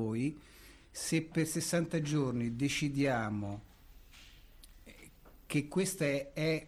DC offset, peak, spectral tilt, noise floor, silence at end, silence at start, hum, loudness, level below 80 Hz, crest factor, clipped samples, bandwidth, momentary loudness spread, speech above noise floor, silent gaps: under 0.1%; -20 dBFS; -5 dB/octave; -57 dBFS; 0 s; 0 s; none; -34 LUFS; -58 dBFS; 16 dB; under 0.1%; 15.5 kHz; 13 LU; 23 dB; none